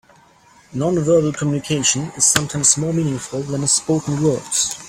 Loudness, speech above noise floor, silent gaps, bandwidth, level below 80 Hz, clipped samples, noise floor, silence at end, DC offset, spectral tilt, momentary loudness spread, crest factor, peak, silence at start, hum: -17 LUFS; 32 dB; none; 16.5 kHz; -52 dBFS; under 0.1%; -50 dBFS; 0 s; under 0.1%; -3.5 dB/octave; 8 LU; 20 dB; 0 dBFS; 0.7 s; none